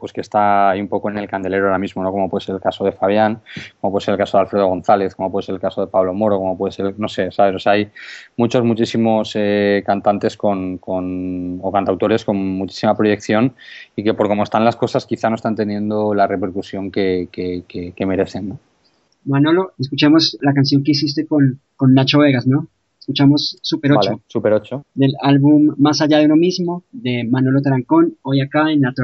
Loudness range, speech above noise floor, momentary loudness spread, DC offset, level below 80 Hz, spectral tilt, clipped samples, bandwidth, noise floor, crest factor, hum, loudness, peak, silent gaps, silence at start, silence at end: 5 LU; 44 dB; 10 LU; under 0.1%; -58 dBFS; -5.5 dB/octave; under 0.1%; 8 kHz; -60 dBFS; 16 dB; none; -17 LUFS; 0 dBFS; none; 0 s; 0 s